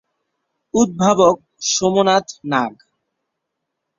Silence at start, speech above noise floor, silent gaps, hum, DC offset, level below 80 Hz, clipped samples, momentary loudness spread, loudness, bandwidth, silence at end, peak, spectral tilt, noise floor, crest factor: 0.75 s; 62 dB; none; none; under 0.1%; -56 dBFS; under 0.1%; 8 LU; -17 LUFS; 7.6 kHz; 1.25 s; 0 dBFS; -4 dB/octave; -78 dBFS; 18 dB